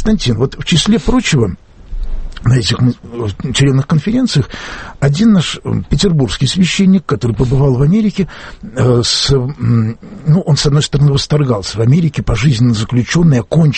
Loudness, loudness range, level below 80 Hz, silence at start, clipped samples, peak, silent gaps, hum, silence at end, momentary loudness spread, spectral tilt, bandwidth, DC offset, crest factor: -13 LUFS; 2 LU; -26 dBFS; 0 s; under 0.1%; 0 dBFS; none; none; 0 s; 10 LU; -6 dB/octave; 8.8 kHz; under 0.1%; 12 dB